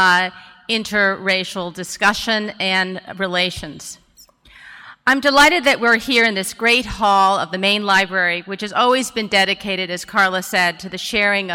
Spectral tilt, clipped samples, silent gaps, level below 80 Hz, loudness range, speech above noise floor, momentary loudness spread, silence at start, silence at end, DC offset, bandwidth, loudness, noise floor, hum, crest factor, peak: -3 dB/octave; under 0.1%; none; -48 dBFS; 6 LU; 31 dB; 11 LU; 0 s; 0 s; under 0.1%; 17 kHz; -17 LUFS; -49 dBFS; none; 14 dB; -4 dBFS